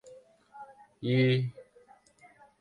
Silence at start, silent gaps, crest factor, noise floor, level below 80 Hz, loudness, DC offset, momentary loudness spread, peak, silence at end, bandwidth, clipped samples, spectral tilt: 0.1 s; none; 18 dB; -60 dBFS; -72 dBFS; -29 LUFS; under 0.1%; 25 LU; -16 dBFS; 1 s; 8.8 kHz; under 0.1%; -8 dB/octave